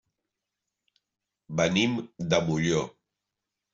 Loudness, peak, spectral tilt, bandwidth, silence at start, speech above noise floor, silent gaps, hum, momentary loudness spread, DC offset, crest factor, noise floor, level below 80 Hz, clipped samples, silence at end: -27 LUFS; -10 dBFS; -5 dB/octave; 7.8 kHz; 1.5 s; 60 dB; none; none; 10 LU; under 0.1%; 22 dB; -86 dBFS; -62 dBFS; under 0.1%; 0.85 s